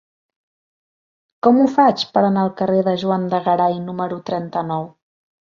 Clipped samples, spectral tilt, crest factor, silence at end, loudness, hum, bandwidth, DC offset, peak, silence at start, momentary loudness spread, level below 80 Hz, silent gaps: under 0.1%; -7.5 dB/octave; 18 dB; 0.7 s; -18 LUFS; none; 7.2 kHz; under 0.1%; -2 dBFS; 1.45 s; 11 LU; -62 dBFS; none